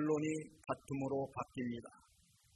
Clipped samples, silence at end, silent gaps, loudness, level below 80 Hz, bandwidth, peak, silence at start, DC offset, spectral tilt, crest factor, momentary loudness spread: under 0.1%; 0.6 s; none; -41 LUFS; -72 dBFS; 12 kHz; -24 dBFS; 0 s; under 0.1%; -6.5 dB/octave; 16 dB; 8 LU